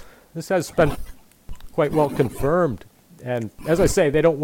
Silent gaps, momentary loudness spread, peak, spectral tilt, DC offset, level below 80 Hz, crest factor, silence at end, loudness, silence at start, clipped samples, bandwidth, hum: none; 18 LU; -6 dBFS; -6 dB/octave; under 0.1%; -38 dBFS; 16 dB; 0 s; -21 LUFS; 0 s; under 0.1%; 17 kHz; none